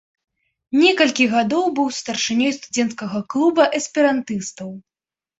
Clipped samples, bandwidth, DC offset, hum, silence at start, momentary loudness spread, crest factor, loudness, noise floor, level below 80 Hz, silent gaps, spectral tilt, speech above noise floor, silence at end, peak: under 0.1%; 8.2 kHz; under 0.1%; none; 0.7 s; 11 LU; 18 dB; -19 LUFS; under -90 dBFS; -64 dBFS; none; -3.5 dB/octave; over 71 dB; 0.6 s; -2 dBFS